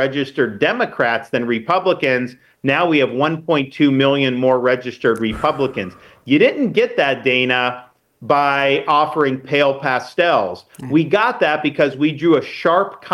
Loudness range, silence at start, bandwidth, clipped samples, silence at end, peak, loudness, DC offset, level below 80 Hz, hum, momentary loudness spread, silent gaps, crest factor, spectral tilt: 1 LU; 0 s; 12 kHz; under 0.1%; 0 s; -2 dBFS; -17 LUFS; under 0.1%; -52 dBFS; none; 5 LU; none; 16 dB; -6.5 dB/octave